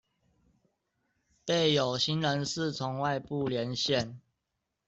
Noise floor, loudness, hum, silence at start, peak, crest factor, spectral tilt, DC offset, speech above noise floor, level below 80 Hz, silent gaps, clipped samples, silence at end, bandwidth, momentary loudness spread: -84 dBFS; -30 LUFS; none; 1.45 s; -14 dBFS; 18 dB; -4.5 dB/octave; under 0.1%; 54 dB; -66 dBFS; none; under 0.1%; 0.7 s; 8.2 kHz; 6 LU